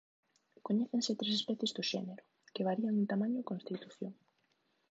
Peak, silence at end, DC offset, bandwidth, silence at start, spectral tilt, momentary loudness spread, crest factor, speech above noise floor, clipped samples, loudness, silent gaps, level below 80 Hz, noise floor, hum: -22 dBFS; 0.8 s; under 0.1%; 8 kHz; 0.65 s; -5 dB/octave; 14 LU; 16 dB; 42 dB; under 0.1%; -36 LUFS; none; -88 dBFS; -78 dBFS; none